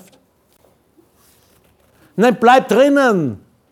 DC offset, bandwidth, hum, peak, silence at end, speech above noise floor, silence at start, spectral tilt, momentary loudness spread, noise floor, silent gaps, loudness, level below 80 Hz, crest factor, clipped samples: under 0.1%; 16.5 kHz; none; 0 dBFS; 0.35 s; 44 dB; 2.15 s; -5.5 dB/octave; 16 LU; -56 dBFS; none; -13 LUFS; -62 dBFS; 16 dB; under 0.1%